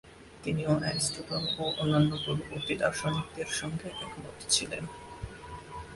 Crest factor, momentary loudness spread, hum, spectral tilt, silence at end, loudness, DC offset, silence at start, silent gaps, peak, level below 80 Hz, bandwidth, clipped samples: 22 dB; 16 LU; none; -4 dB/octave; 0 s; -31 LUFS; under 0.1%; 0.05 s; none; -12 dBFS; -54 dBFS; 11.5 kHz; under 0.1%